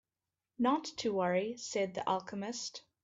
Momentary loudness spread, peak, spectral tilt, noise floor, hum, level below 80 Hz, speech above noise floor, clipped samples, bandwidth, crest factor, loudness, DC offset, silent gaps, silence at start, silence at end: 8 LU; -20 dBFS; -4 dB/octave; under -90 dBFS; none; -78 dBFS; over 55 dB; under 0.1%; 8 kHz; 16 dB; -35 LUFS; under 0.1%; none; 0.6 s; 0.25 s